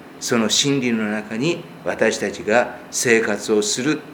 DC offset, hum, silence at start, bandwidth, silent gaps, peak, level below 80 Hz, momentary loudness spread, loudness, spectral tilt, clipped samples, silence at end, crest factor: under 0.1%; none; 0 s; 19.5 kHz; none; 0 dBFS; -60 dBFS; 7 LU; -20 LUFS; -3 dB/octave; under 0.1%; 0 s; 20 dB